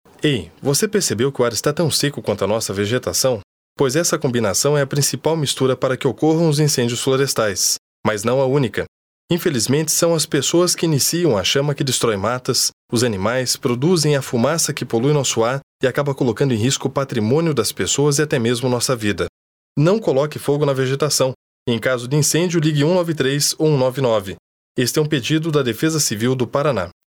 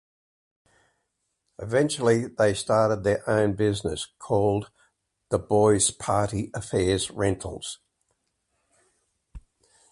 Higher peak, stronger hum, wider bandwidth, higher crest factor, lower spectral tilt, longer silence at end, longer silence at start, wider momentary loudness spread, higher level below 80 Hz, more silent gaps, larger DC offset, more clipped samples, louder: first, -2 dBFS vs -8 dBFS; neither; first, 20 kHz vs 11.5 kHz; about the same, 16 dB vs 18 dB; about the same, -4 dB/octave vs -5 dB/octave; second, 0.15 s vs 0.55 s; second, 0.2 s vs 1.6 s; second, 5 LU vs 13 LU; second, -56 dBFS vs -50 dBFS; first, 3.44-3.76 s, 7.78-8.03 s, 8.88-9.28 s, 12.73-12.89 s, 15.63-15.79 s, 19.29-19.76 s, 21.35-21.66 s, 24.39-24.75 s vs none; neither; neither; first, -18 LUFS vs -25 LUFS